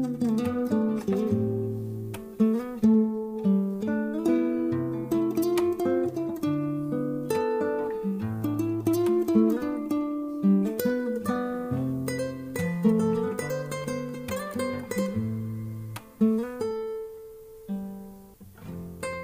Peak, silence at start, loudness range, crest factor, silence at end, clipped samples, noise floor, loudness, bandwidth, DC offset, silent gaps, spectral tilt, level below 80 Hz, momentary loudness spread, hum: -10 dBFS; 0 s; 5 LU; 16 dB; 0 s; under 0.1%; -48 dBFS; -27 LUFS; 16 kHz; under 0.1%; none; -7.5 dB/octave; -60 dBFS; 12 LU; none